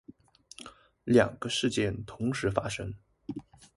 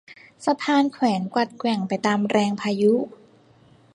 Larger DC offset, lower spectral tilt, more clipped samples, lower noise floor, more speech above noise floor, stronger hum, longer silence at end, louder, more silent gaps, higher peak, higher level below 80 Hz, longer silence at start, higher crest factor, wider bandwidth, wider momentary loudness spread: neither; about the same, -5 dB/octave vs -5.5 dB/octave; neither; about the same, -55 dBFS vs -54 dBFS; second, 26 dB vs 33 dB; neither; second, 0.1 s vs 0.85 s; second, -29 LUFS vs -22 LUFS; neither; about the same, -8 dBFS vs -6 dBFS; first, -54 dBFS vs -68 dBFS; about the same, 0.1 s vs 0.1 s; first, 24 dB vs 16 dB; about the same, 11.5 kHz vs 11 kHz; first, 22 LU vs 5 LU